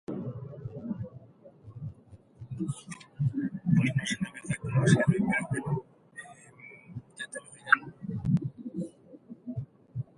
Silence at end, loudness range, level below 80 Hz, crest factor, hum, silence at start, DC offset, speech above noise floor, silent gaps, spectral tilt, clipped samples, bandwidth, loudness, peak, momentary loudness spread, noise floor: 0.15 s; 8 LU; -58 dBFS; 26 dB; none; 0.1 s; under 0.1%; 28 dB; none; -6 dB/octave; under 0.1%; 11.5 kHz; -31 LUFS; -6 dBFS; 21 LU; -55 dBFS